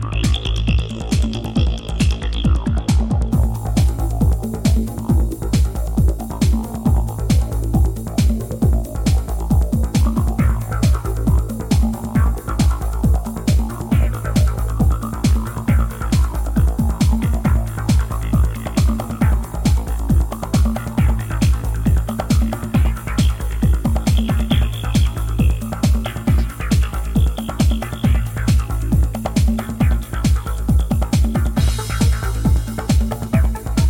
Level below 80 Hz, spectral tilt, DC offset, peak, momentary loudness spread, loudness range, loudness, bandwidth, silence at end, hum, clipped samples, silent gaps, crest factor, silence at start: -20 dBFS; -6.5 dB/octave; under 0.1%; -4 dBFS; 2 LU; 1 LU; -19 LUFS; 17 kHz; 0 s; none; under 0.1%; none; 12 dB; 0 s